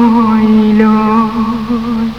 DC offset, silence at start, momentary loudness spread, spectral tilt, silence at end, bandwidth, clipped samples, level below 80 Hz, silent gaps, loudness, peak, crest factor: 0.9%; 0 s; 7 LU; -8 dB/octave; 0 s; 6.2 kHz; 0.1%; -36 dBFS; none; -10 LUFS; 0 dBFS; 10 dB